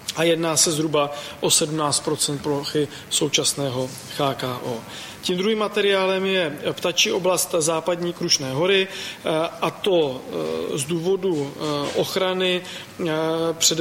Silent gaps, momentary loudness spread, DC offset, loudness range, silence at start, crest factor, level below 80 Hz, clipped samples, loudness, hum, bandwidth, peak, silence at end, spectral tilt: none; 9 LU; under 0.1%; 3 LU; 0 s; 20 dB; -62 dBFS; under 0.1%; -22 LUFS; none; 16.5 kHz; -4 dBFS; 0 s; -3 dB/octave